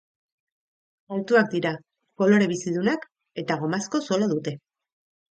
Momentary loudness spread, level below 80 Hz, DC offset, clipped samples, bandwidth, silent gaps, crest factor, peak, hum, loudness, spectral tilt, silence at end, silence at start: 14 LU; -72 dBFS; under 0.1%; under 0.1%; 8.8 kHz; none; 20 dB; -6 dBFS; none; -24 LUFS; -5.5 dB/octave; 0.75 s; 1.1 s